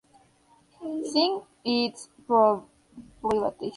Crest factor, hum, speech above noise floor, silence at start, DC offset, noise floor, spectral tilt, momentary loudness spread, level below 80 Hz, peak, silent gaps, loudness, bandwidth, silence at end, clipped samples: 18 dB; none; 36 dB; 0.8 s; under 0.1%; -61 dBFS; -4.5 dB/octave; 13 LU; -62 dBFS; -8 dBFS; none; -26 LUFS; 11.5 kHz; 0 s; under 0.1%